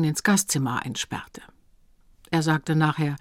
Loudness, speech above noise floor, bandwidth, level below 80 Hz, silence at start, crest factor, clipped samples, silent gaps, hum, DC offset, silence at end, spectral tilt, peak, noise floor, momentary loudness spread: -24 LUFS; 34 dB; 16.5 kHz; -56 dBFS; 0 s; 18 dB; under 0.1%; none; none; under 0.1%; 0.05 s; -4.5 dB/octave; -8 dBFS; -58 dBFS; 11 LU